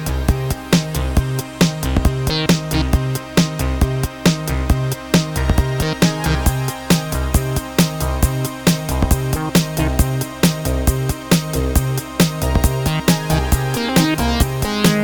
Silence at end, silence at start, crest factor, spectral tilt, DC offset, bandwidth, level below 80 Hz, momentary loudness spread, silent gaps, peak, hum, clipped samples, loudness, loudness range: 0 s; 0 s; 16 dB; -5 dB/octave; under 0.1%; 19.5 kHz; -24 dBFS; 3 LU; none; 0 dBFS; none; under 0.1%; -18 LUFS; 1 LU